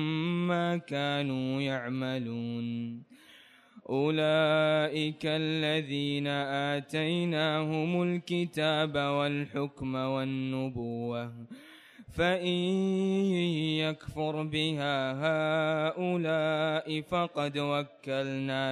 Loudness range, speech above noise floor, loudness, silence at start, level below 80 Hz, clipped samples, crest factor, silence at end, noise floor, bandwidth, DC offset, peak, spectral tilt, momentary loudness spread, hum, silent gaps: 4 LU; 27 dB; -30 LUFS; 0 s; -64 dBFS; under 0.1%; 14 dB; 0 s; -57 dBFS; 12.5 kHz; under 0.1%; -16 dBFS; -6.5 dB/octave; 7 LU; none; none